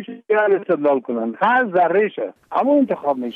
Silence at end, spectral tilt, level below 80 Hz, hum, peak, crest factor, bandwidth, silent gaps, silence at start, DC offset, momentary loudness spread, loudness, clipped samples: 0.05 s; -8 dB/octave; -68 dBFS; none; -6 dBFS; 12 dB; 4.7 kHz; none; 0 s; under 0.1%; 7 LU; -18 LUFS; under 0.1%